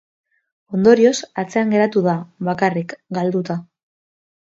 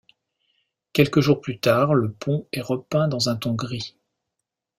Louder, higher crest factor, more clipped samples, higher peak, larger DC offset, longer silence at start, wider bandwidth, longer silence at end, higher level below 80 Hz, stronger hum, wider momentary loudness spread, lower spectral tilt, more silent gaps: first, -18 LUFS vs -22 LUFS; about the same, 18 dB vs 20 dB; neither; about the same, 0 dBFS vs -2 dBFS; neither; second, 0.7 s vs 0.95 s; second, 8 kHz vs 16 kHz; about the same, 0.8 s vs 0.9 s; second, -64 dBFS vs -58 dBFS; neither; first, 13 LU vs 9 LU; about the same, -6 dB/octave vs -6 dB/octave; neither